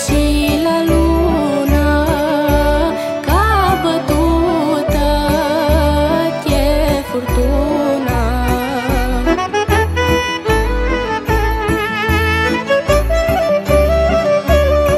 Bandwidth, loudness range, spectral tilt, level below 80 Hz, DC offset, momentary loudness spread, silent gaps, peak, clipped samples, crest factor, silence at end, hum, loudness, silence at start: 15.5 kHz; 2 LU; -6 dB/octave; -20 dBFS; under 0.1%; 4 LU; none; 0 dBFS; under 0.1%; 14 dB; 0 s; none; -14 LUFS; 0 s